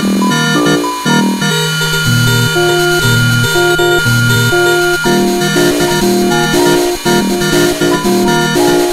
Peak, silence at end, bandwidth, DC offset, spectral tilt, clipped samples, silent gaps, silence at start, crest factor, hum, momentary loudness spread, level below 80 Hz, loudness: 0 dBFS; 0 s; 16 kHz; under 0.1%; -4.5 dB/octave; under 0.1%; none; 0 s; 10 dB; none; 2 LU; -34 dBFS; -10 LUFS